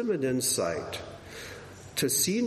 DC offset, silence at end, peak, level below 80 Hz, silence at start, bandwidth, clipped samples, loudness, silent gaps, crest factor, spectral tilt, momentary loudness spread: under 0.1%; 0 s; -12 dBFS; -60 dBFS; 0 s; 13.5 kHz; under 0.1%; -28 LUFS; none; 18 dB; -3 dB/octave; 17 LU